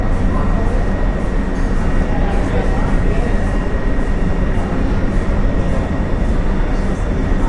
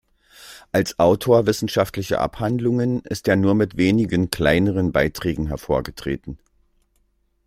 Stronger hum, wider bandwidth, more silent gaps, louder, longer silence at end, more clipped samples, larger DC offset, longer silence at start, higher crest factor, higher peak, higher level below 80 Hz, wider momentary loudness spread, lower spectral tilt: neither; second, 9.4 kHz vs 16 kHz; neither; about the same, -19 LUFS vs -20 LUFS; second, 0 s vs 1.1 s; neither; neither; second, 0 s vs 0.4 s; second, 12 dB vs 20 dB; about the same, -2 dBFS vs 0 dBFS; first, -16 dBFS vs -42 dBFS; second, 2 LU vs 11 LU; first, -7.5 dB/octave vs -6 dB/octave